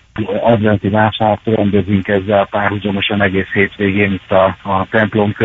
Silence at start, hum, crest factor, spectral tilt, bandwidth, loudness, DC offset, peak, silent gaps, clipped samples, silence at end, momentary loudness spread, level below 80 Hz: 0.15 s; none; 14 dB; -9 dB/octave; 4 kHz; -14 LUFS; under 0.1%; 0 dBFS; none; under 0.1%; 0 s; 3 LU; -44 dBFS